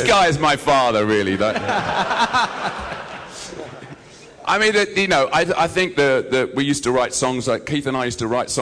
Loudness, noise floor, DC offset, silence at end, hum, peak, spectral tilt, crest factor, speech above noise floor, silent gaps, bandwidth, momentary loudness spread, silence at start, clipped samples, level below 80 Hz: -18 LUFS; -42 dBFS; under 0.1%; 0 s; none; -2 dBFS; -4 dB/octave; 16 dB; 24 dB; none; 11 kHz; 16 LU; 0 s; under 0.1%; -46 dBFS